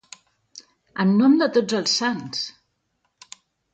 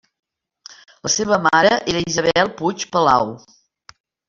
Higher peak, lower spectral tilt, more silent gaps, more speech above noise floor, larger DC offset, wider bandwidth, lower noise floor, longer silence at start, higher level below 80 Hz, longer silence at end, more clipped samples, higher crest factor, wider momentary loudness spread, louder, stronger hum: second, -6 dBFS vs -2 dBFS; first, -4.5 dB/octave vs -3 dB/octave; neither; first, 53 dB vs 28 dB; neither; first, 9 kHz vs 7.8 kHz; first, -72 dBFS vs -46 dBFS; first, 0.95 s vs 0.7 s; second, -70 dBFS vs -52 dBFS; first, 1.25 s vs 0.9 s; neither; about the same, 16 dB vs 18 dB; first, 13 LU vs 8 LU; second, -21 LUFS vs -17 LUFS; neither